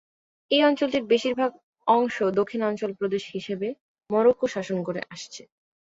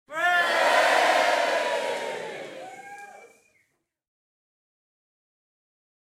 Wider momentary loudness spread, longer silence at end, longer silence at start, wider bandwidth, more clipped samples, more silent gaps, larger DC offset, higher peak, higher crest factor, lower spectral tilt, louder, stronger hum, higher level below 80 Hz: second, 12 LU vs 22 LU; second, 0.55 s vs 2.8 s; first, 0.5 s vs 0.1 s; second, 7.8 kHz vs 16.5 kHz; neither; first, 1.63-1.73 s, 3.80-3.95 s vs none; neither; about the same, -6 dBFS vs -8 dBFS; about the same, 18 dB vs 18 dB; first, -5 dB/octave vs -0.5 dB/octave; second, -25 LUFS vs -22 LUFS; neither; first, -68 dBFS vs -82 dBFS